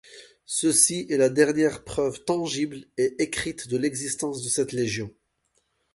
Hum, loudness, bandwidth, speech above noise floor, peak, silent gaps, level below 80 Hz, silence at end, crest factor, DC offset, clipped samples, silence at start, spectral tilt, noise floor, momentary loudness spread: none; -24 LUFS; 12 kHz; 47 dB; -6 dBFS; none; -58 dBFS; 0.85 s; 20 dB; under 0.1%; under 0.1%; 0.1 s; -3.5 dB/octave; -72 dBFS; 10 LU